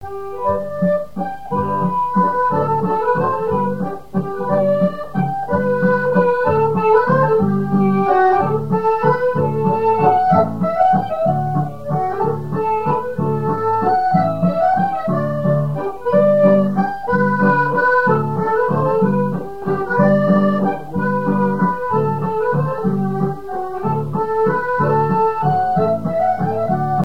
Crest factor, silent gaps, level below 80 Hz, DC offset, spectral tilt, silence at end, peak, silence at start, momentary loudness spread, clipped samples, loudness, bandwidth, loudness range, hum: 16 dB; none; -50 dBFS; 2%; -9.5 dB/octave; 0 s; -2 dBFS; 0 s; 7 LU; under 0.1%; -17 LUFS; 6.2 kHz; 3 LU; none